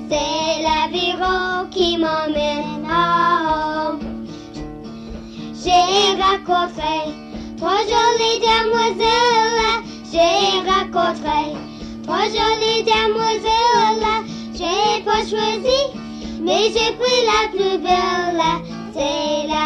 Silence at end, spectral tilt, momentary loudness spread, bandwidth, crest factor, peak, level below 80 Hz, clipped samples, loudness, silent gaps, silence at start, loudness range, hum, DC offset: 0 s; -3 dB/octave; 15 LU; 11.5 kHz; 14 dB; -4 dBFS; -42 dBFS; under 0.1%; -18 LUFS; none; 0 s; 3 LU; none; under 0.1%